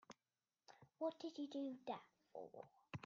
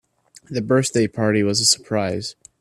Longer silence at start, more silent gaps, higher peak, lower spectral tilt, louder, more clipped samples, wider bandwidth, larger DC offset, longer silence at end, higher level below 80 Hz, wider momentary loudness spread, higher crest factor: second, 0.1 s vs 0.5 s; neither; second, -34 dBFS vs -2 dBFS; first, -5 dB/octave vs -3.5 dB/octave; second, -51 LUFS vs -19 LUFS; neither; second, 7.4 kHz vs 15 kHz; neither; second, 0 s vs 0.3 s; second, -88 dBFS vs -56 dBFS; first, 20 LU vs 12 LU; about the same, 18 dB vs 18 dB